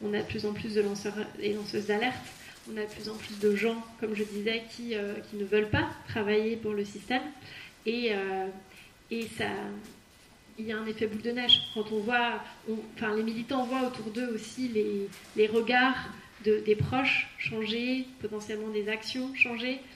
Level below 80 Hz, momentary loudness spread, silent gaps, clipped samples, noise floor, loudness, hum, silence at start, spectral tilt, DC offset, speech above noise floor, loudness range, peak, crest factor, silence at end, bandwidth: -62 dBFS; 12 LU; none; under 0.1%; -57 dBFS; -30 LUFS; none; 0 s; -4.5 dB/octave; under 0.1%; 26 dB; 6 LU; -10 dBFS; 22 dB; 0 s; 15 kHz